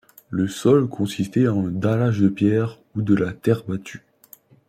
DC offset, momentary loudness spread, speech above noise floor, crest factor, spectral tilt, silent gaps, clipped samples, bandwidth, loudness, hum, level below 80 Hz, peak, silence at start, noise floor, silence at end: under 0.1%; 10 LU; 31 dB; 16 dB; -7.5 dB/octave; none; under 0.1%; 15.5 kHz; -21 LUFS; none; -58 dBFS; -4 dBFS; 0.3 s; -51 dBFS; 0.7 s